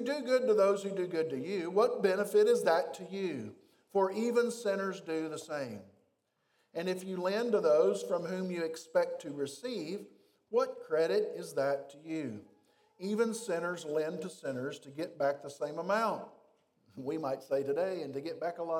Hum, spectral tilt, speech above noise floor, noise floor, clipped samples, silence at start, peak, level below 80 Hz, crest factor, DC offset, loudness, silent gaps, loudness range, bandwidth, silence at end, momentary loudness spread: none; -5 dB/octave; 45 dB; -77 dBFS; under 0.1%; 0 s; -16 dBFS; -90 dBFS; 18 dB; under 0.1%; -33 LUFS; none; 6 LU; 17 kHz; 0 s; 13 LU